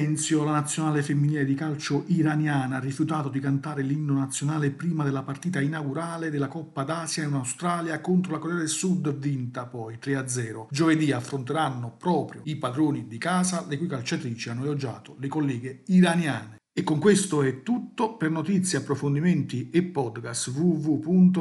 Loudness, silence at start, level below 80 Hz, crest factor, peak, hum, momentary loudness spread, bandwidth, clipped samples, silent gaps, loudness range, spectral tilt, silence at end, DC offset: -26 LUFS; 0 s; -70 dBFS; 18 dB; -6 dBFS; none; 8 LU; 12 kHz; under 0.1%; none; 4 LU; -5.5 dB/octave; 0 s; under 0.1%